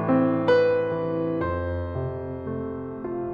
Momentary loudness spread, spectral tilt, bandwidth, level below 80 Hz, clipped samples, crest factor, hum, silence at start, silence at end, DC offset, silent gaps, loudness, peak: 12 LU; -9 dB/octave; 6.6 kHz; -46 dBFS; under 0.1%; 16 dB; none; 0 s; 0 s; under 0.1%; none; -25 LUFS; -10 dBFS